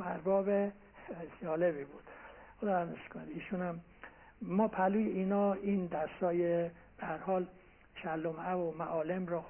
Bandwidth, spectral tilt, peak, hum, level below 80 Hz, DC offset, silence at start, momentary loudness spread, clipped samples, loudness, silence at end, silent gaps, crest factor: 3.3 kHz; -7 dB/octave; -18 dBFS; none; -66 dBFS; under 0.1%; 0 s; 18 LU; under 0.1%; -35 LUFS; 0 s; none; 16 dB